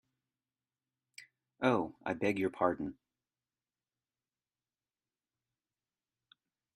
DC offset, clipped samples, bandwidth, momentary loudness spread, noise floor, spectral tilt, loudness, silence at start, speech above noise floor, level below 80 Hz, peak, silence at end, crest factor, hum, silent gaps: under 0.1%; under 0.1%; 11.5 kHz; 23 LU; under -90 dBFS; -6.5 dB/octave; -34 LUFS; 1.2 s; over 57 dB; -74 dBFS; -14 dBFS; 3.85 s; 26 dB; none; none